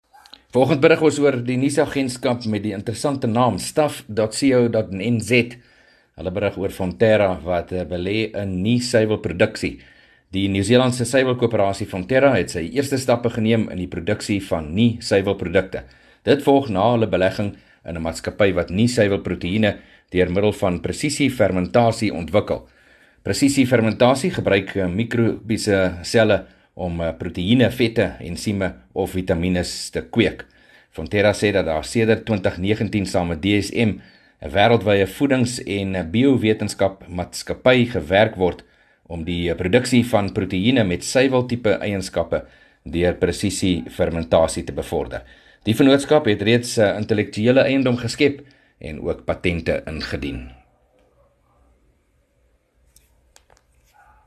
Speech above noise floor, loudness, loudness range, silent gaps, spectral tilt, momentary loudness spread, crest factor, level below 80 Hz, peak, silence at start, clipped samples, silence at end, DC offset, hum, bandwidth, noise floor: 43 dB; -20 LUFS; 3 LU; none; -5.5 dB/octave; 11 LU; 18 dB; -42 dBFS; -2 dBFS; 0.55 s; under 0.1%; 3.7 s; under 0.1%; none; 13.5 kHz; -63 dBFS